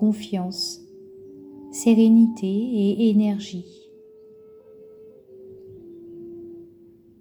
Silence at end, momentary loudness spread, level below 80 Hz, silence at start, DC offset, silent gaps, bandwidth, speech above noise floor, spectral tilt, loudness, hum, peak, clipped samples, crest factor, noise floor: 0.55 s; 27 LU; -68 dBFS; 0 s; under 0.1%; none; 19 kHz; 31 dB; -6 dB/octave; -20 LUFS; none; -8 dBFS; under 0.1%; 16 dB; -51 dBFS